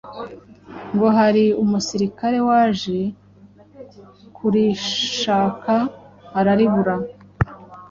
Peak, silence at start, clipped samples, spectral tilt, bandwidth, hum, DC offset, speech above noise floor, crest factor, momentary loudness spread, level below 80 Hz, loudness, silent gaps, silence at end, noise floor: -2 dBFS; 0.05 s; under 0.1%; -5.5 dB/octave; 7.6 kHz; 50 Hz at -40 dBFS; under 0.1%; 30 dB; 18 dB; 16 LU; -46 dBFS; -19 LUFS; none; 0.05 s; -48 dBFS